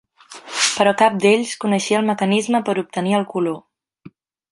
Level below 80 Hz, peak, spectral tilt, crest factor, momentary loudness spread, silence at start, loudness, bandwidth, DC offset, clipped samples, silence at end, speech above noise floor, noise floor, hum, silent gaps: -66 dBFS; -2 dBFS; -4 dB/octave; 18 dB; 9 LU; 0.3 s; -18 LUFS; 11.5 kHz; under 0.1%; under 0.1%; 0.45 s; 28 dB; -46 dBFS; none; none